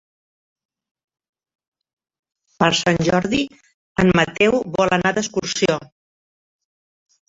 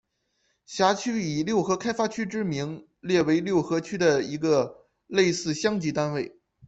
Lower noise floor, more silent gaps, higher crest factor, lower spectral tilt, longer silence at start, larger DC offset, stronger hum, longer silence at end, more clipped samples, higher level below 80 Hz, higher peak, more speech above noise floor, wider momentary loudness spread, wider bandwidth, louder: first, under -90 dBFS vs -73 dBFS; first, 3.74-3.95 s vs none; about the same, 20 dB vs 18 dB; about the same, -4.5 dB/octave vs -5 dB/octave; first, 2.6 s vs 0.7 s; neither; neither; first, 1.45 s vs 0.4 s; neither; first, -50 dBFS vs -64 dBFS; first, -2 dBFS vs -8 dBFS; first, over 72 dB vs 48 dB; about the same, 7 LU vs 9 LU; about the same, 7.8 kHz vs 8.2 kHz; first, -19 LUFS vs -26 LUFS